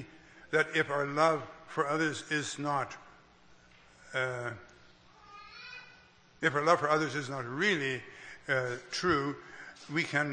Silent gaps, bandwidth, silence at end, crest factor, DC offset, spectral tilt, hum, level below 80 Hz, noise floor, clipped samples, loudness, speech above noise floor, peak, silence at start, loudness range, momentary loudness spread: none; 9.8 kHz; 0 s; 24 dB; under 0.1%; -4.5 dB/octave; none; -68 dBFS; -60 dBFS; under 0.1%; -32 LUFS; 29 dB; -10 dBFS; 0 s; 8 LU; 20 LU